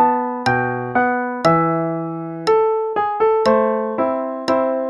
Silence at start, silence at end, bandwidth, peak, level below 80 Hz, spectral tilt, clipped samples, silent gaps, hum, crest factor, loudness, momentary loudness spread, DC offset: 0 s; 0 s; 11 kHz; -2 dBFS; -54 dBFS; -6.5 dB/octave; under 0.1%; none; none; 16 dB; -18 LUFS; 6 LU; under 0.1%